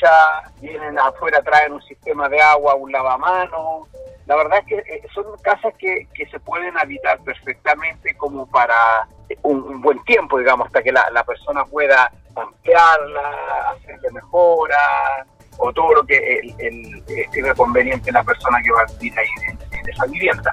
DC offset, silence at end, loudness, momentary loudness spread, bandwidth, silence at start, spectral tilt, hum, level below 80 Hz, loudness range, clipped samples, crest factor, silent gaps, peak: under 0.1%; 0 s; -16 LUFS; 15 LU; 12 kHz; 0 s; -5 dB/octave; none; -44 dBFS; 5 LU; under 0.1%; 16 dB; none; -2 dBFS